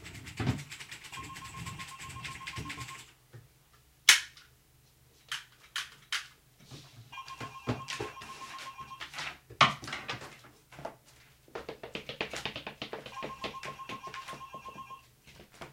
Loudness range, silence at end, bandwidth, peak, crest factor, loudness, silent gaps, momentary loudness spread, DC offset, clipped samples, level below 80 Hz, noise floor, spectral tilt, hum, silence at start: 11 LU; 0 s; 16.5 kHz; -2 dBFS; 34 dB; -34 LUFS; none; 23 LU; under 0.1%; under 0.1%; -60 dBFS; -64 dBFS; -2 dB/octave; none; 0 s